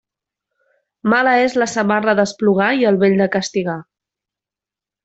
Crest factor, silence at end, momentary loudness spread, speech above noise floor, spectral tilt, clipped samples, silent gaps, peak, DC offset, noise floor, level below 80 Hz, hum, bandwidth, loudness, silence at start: 16 dB; 1.2 s; 8 LU; 73 dB; -5.5 dB/octave; under 0.1%; none; -2 dBFS; under 0.1%; -89 dBFS; -60 dBFS; none; 8.2 kHz; -16 LUFS; 1.05 s